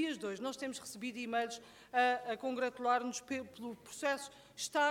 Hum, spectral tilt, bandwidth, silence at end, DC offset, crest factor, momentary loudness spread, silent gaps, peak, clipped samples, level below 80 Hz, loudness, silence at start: none; -2.5 dB/octave; 17 kHz; 0 s; under 0.1%; 18 dB; 12 LU; none; -20 dBFS; under 0.1%; -78 dBFS; -38 LUFS; 0 s